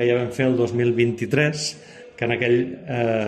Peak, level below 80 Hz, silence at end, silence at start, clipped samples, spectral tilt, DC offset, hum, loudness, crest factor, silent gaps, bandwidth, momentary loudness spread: -4 dBFS; -60 dBFS; 0 s; 0 s; under 0.1%; -6 dB/octave; under 0.1%; none; -22 LUFS; 16 dB; none; 12 kHz; 8 LU